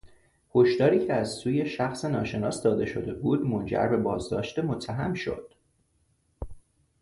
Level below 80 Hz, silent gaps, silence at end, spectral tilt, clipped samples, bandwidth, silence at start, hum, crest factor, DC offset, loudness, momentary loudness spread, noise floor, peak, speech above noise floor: -52 dBFS; none; 0.4 s; -6.5 dB/octave; under 0.1%; 11.5 kHz; 0.05 s; none; 18 dB; under 0.1%; -27 LUFS; 11 LU; -69 dBFS; -10 dBFS; 43 dB